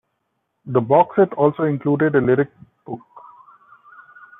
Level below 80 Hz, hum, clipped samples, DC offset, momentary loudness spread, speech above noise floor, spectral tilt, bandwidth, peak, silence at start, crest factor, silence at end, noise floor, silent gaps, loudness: -62 dBFS; none; under 0.1%; under 0.1%; 19 LU; 56 dB; -11.5 dB/octave; 3.8 kHz; -2 dBFS; 0.65 s; 18 dB; 1.2 s; -73 dBFS; none; -18 LUFS